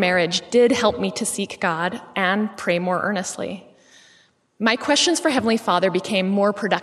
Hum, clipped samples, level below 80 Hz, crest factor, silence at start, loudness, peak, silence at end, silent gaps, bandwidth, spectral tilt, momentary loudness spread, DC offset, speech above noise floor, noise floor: none; under 0.1%; -64 dBFS; 20 dB; 0 s; -20 LUFS; -2 dBFS; 0 s; none; 13.5 kHz; -3.5 dB/octave; 8 LU; under 0.1%; 37 dB; -57 dBFS